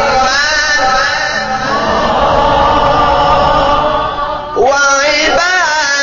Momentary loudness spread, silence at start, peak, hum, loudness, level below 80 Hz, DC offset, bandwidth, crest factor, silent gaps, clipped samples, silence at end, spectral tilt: 5 LU; 0 s; 0 dBFS; none; -10 LUFS; -28 dBFS; under 0.1%; 7.4 kHz; 10 dB; none; under 0.1%; 0 s; -1 dB/octave